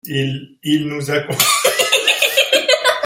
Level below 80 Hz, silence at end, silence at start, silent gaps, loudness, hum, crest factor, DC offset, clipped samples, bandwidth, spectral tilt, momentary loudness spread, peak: -60 dBFS; 0 s; 0.05 s; none; -14 LUFS; none; 16 dB; under 0.1%; under 0.1%; 16.5 kHz; -2.5 dB/octave; 8 LU; 0 dBFS